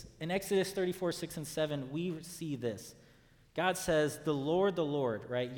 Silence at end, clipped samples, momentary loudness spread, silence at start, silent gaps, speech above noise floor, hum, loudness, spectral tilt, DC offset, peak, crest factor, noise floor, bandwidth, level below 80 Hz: 0 s; under 0.1%; 9 LU; 0 s; none; 29 dB; none; -35 LUFS; -5 dB/octave; under 0.1%; -16 dBFS; 20 dB; -63 dBFS; 19.5 kHz; -64 dBFS